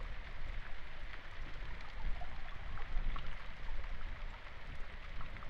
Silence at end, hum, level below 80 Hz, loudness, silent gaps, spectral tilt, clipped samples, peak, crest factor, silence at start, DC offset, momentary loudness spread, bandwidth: 0 s; none; -42 dBFS; -49 LUFS; none; -5.5 dB/octave; under 0.1%; -22 dBFS; 14 dB; 0 s; under 0.1%; 5 LU; 5.6 kHz